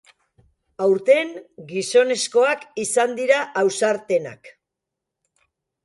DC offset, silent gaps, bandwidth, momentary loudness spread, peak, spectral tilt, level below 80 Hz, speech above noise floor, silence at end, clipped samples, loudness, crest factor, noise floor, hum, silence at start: under 0.1%; none; 11.5 kHz; 11 LU; -4 dBFS; -3 dB/octave; -70 dBFS; 63 dB; 1.35 s; under 0.1%; -20 LUFS; 18 dB; -83 dBFS; none; 0.8 s